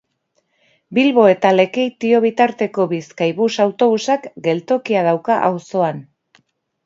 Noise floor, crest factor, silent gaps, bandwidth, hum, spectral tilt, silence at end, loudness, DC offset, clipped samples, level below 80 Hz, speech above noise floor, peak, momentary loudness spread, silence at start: -67 dBFS; 16 dB; none; 7.8 kHz; none; -6 dB/octave; 0.85 s; -16 LUFS; under 0.1%; under 0.1%; -70 dBFS; 51 dB; 0 dBFS; 9 LU; 0.9 s